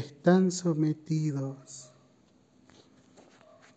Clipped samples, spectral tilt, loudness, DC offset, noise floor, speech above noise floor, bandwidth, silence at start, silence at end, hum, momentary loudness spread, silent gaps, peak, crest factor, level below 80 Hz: under 0.1%; -6.5 dB/octave; -28 LUFS; under 0.1%; -63 dBFS; 36 dB; 9 kHz; 0 s; 1.95 s; none; 21 LU; none; -10 dBFS; 22 dB; -72 dBFS